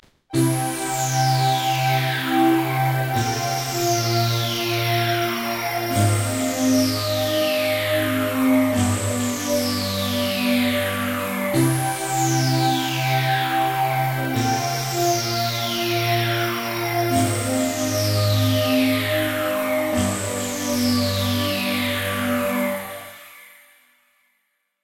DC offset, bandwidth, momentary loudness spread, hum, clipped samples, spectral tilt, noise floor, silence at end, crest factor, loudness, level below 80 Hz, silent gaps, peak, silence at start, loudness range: under 0.1%; 16.5 kHz; 4 LU; none; under 0.1%; -4.5 dB/octave; -71 dBFS; 1.35 s; 14 dB; -21 LUFS; -54 dBFS; none; -6 dBFS; 0.3 s; 2 LU